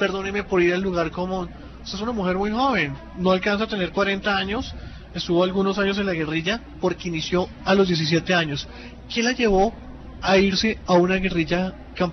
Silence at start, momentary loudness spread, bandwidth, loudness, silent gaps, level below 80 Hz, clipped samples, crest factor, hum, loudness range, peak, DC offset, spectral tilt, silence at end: 0 s; 11 LU; 6.4 kHz; -22 LUFS; none; -40 dBFS; under 0.1%; 16 dB; none; 3 LU; -8 dBFS; under 0.1%; -5.5 dB/octave; 0 s